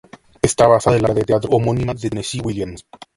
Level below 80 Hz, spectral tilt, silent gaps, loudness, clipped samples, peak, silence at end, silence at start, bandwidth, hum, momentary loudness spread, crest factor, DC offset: -40 dBFS; -5.5 dB/octave; none; -17 LUFS; under 0.1%; 0 dBFS; 0.35 s; 0.45 s; 11.5 kHz; none; 12 LU; 18 dB; under 0.1%